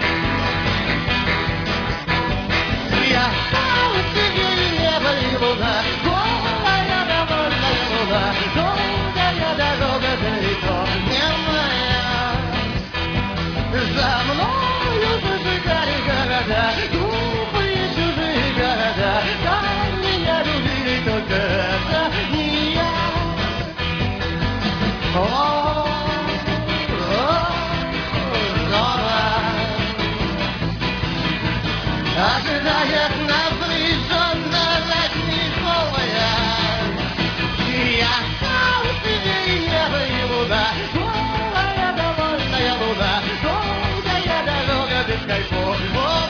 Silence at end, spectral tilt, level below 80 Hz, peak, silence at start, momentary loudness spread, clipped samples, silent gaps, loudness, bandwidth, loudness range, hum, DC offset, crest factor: 0 s; -5.5 dB/octave; -32 dBFS; -4 dBFS; 0 s; 4 LU; under 0.1%; none; -19 LUFS; 5.4 kHz; 2 LU; none; under 0.1%; 16 dB